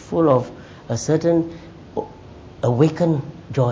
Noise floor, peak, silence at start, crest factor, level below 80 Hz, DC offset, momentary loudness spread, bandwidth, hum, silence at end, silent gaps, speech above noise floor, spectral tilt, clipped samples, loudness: -40 dBFS; -2 dBFS; 0 s; 18 dB; -48 dBFS; under 0.1%; 17 LU; 8 kHz; none; 0 s; none; 22 dB; -7.5 dB/octave; under 0.1%; -21 LUFS